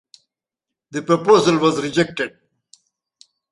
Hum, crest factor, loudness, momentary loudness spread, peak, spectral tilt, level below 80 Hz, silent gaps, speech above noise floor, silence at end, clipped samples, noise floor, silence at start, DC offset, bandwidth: none; 18 dB; -18 LUFS; 15 LU; -2 dBFS; -5 dB/octave; -60 dBFS; none; 68 dB; 1.25 s; under 0.1%; -85 dBFS; 0.9 s; under 0.1%; 11.5 kHz